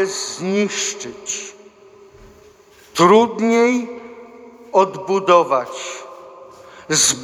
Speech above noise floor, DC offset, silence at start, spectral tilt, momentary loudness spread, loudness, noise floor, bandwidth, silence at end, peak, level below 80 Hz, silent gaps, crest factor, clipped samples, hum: 31 dB; under 0.1%; 0 s; -3 dB/octave; 20 LU; -17 LUFS; -47 dBFS; 16 kHz; 0 s; 0 dBFS; -60 dBFS; none; 18 dB; under 0.1%; none